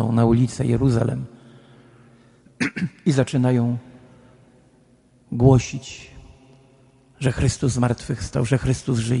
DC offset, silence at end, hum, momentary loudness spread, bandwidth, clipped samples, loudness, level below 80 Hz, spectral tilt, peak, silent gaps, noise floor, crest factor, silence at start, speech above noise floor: under 0.1%; 0 s; none; 14 LU; 11 kHz; under 0.1%; -21 LUFS; -42 dBFS; -7 dB/octave; -2 dBFS; none; -56 dBFS; 20 dB; 0 s; 36 dB